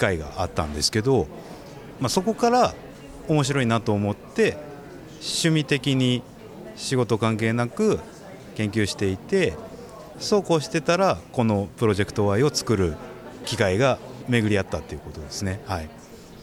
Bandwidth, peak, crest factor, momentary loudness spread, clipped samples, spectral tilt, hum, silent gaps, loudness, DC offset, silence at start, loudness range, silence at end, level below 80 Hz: 16.5 kHz; -6 dBFS; 18 dB; 19 LU; under 0.1%; -5 dB/octave; none; none; -24 LUFS; under 0.1%; 0 s; 2 LU; 0 s; -46 dBFS